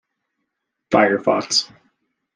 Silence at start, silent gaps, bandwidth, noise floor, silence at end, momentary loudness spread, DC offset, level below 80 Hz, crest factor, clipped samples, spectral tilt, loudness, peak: 0.9 s; none; 11.5 kHz; -78 dBFS; 0.7 s; 4 LU; under 0.1%; -60 dBFS; 20 dB; under 0.1%; -3 dB/octave; -18 LUFS; -2 dBFS